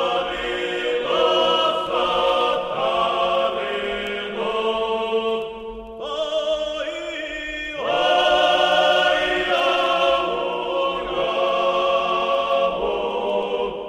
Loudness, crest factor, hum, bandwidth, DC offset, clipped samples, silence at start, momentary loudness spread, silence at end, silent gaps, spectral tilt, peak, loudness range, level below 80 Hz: -21 LUFS; 16 dB; none; 12 kHz; under 0.1%; under 0.1%; 0 s; 10 LU; 0 s; none; -3 dB/octave; -6 dBFS; 6 LU; -50 dBFS